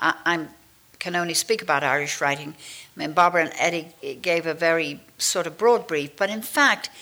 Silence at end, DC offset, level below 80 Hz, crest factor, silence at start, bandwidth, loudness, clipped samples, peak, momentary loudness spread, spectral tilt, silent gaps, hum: 0 s; under 0.1%; -68 dBFS; 18 dB; 0 s; over 20 kHz; -23 LUFS; under 0.1%; -6 dBFS; 13 LU; -2.5 dB/octave; none; none